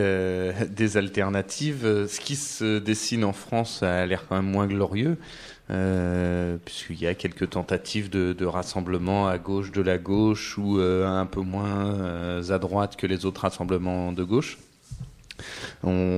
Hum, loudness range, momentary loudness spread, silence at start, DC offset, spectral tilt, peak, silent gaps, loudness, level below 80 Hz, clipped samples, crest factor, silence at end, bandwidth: none; 3 LU; 8 LU; 0 s; under 0.1%; -5.5 dB/octave; -8 dBFS; none; -26 LUFS; -44 dBFS; under 0.1%; 18 dB; 0 s; 14 kHz